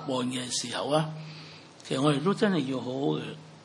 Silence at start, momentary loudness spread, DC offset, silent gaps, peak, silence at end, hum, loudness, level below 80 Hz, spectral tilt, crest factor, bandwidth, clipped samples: 0 s; 17 LU; under 0.1%; none; -10 dBFS; 0 s; none; -29 LUFS; -76 dBFS; -5 dB/octave; 18 dB; 11.5 kHz; under 0.1%